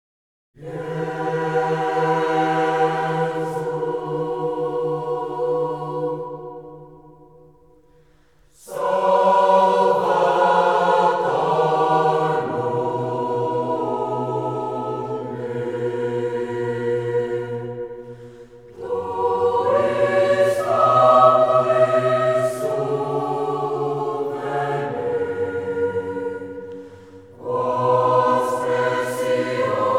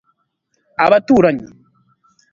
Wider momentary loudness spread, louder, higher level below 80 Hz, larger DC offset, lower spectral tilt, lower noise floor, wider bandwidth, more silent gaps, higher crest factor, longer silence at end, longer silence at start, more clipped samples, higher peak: second, 12 LU vs 15 LU; second, -20 LUFS vs -14 LUFS; second, -62 dBFS vs -54 dBFS; first, 0.1% vs under 0.1%; about the same, -6.5 dB/octave vs -7 dB/octave; second, -57 dBFS vs -68 dBFS; first, 14.5 kHz vs 7.4 kHz; neither; about the same, 18 dB vs 18 dB; second, 0 s vs 0.85 s; second, 0.6 s vs 0.8 s; neither; about the same, -2 dBFS vs 0 dBFS